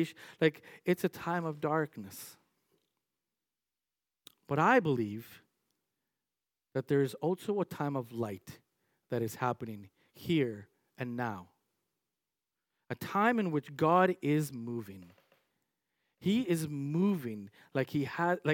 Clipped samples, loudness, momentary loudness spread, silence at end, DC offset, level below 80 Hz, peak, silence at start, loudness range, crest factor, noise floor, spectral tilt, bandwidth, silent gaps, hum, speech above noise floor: under 0.1%; -33 LUFS; 18 LU; 0 s; under 0.1%; -78 dBFS; -12 dBFS; 0 s; 6 LU; 22 dB; under -90 dBFS; -6.5 dB/octave; 18 kHz; none; none; over 57 dB